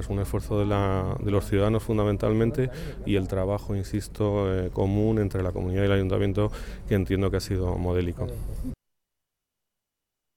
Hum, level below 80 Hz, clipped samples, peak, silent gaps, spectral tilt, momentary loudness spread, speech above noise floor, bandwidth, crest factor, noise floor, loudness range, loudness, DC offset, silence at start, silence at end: none; -38 dBFS; under 0.1%; -12 dBFS; none; -7.5 dB/octave; 9 LU; 60 dB; 15.5 kHz; 14 dB; -85 dBFS; 4 LU; -26 LUFS; under 0.1%; 0 s; 1.65 s